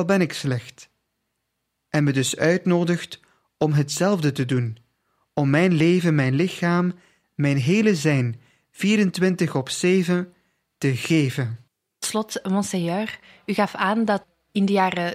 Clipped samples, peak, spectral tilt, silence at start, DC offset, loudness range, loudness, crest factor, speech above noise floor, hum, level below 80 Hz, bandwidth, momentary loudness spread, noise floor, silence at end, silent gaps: under 0.1%; -4 dBFS; -6 dB/octave; 0 s; under 0.1%; 4 LU; -22 LUFS; 18 dB; 56 dB; none; -64 dBFS; 15.5 kHz; 11 LU; -77 dBFS; 0 s; none